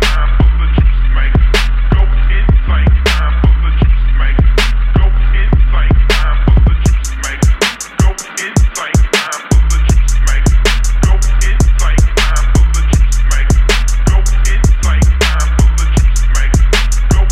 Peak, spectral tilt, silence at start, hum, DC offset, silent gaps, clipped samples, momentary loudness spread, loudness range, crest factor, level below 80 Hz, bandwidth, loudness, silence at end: 0 dBFS; -4.5 dB/octave; 0 s; none; under 0.1%; none; under 0.1%; 3 LU; 1 LU; 8 dB; -10 dBFS; 12.5 kHz; -12 LUFS; 0 s